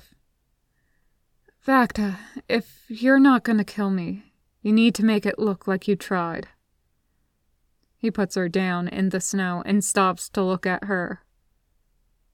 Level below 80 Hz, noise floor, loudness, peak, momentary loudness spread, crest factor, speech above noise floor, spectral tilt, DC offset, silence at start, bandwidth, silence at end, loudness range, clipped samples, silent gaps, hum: -58 dBFS; -70 dBFS; -23 LUFS; -4 dBFS; 13 LU; 20 dB; 48 dB; -5 dB/octave; under 0.1%; 1.65 s; 16 kHz; 1.15 s; 6 LU; under 0.1%; none; none